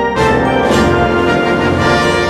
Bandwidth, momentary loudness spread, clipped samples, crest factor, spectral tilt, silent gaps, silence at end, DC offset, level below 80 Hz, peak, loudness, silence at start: 14.5 kHz; 1 LU; under 0.1%; 10 dB; -5.5 dB/octave; none; 0 s; under 0.1%; -28 dBFS; 0 dBFS; -12 LUFS; 0 s